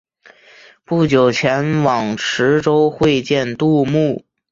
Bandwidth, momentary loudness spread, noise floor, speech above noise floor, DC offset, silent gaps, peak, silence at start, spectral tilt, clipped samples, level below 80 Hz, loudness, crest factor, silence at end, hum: 7.8 kHz; 6 LU; -47 dBFS; 32 dB; under 0.1%; none; -2 dBFS; 0.9 s; -6 dB/octave; under 0.1%; -50 dBFS; -16 LUFS; 14 dB; 0.3 s; none